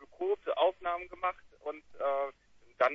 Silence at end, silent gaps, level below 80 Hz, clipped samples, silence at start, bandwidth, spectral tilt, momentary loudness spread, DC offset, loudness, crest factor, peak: 0 s; none; -66 dBFS; under 0.1%; 0 s; 7 kHz; -4.5 dB/octave; 13 LU; under 0.1%; -34 LUFS; 20 dB; -14 dBFS